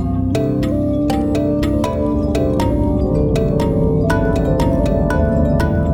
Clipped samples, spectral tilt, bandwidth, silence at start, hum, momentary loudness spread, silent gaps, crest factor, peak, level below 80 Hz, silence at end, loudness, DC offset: under 0.1%; -8 dB/octave; 17 kHz; 0 s; none; 2 LU; none; 12 dB; -4 dBFS; -24 dBFS; 0 s; -17 LUFS; under 0.1%